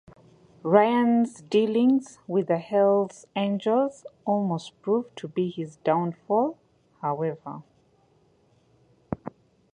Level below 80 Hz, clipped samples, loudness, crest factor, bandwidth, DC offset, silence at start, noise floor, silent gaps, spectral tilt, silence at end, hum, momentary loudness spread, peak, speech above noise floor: -68 dBFS; under 0.1%; -25 LUFS; 22 dB; 10.5 kHz; under 0.1%; 0.65 s; -63 dBFS; none; -7 dB/octave; 0.45 s; none; 15 LU; -4 dBFS; 39 dB